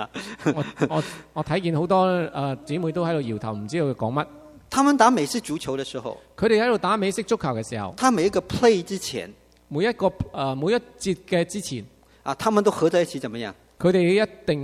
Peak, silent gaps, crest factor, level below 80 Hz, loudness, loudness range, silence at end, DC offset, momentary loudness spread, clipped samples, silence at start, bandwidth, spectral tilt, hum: -2 dBFS; none; 22 dB; -52 dBFS; -23 LUFS; 3 LU; 0 s; under 0.1%; 12 LU; under 0.1%; 0 s; 15 kHz; -5.5 dB/octave; none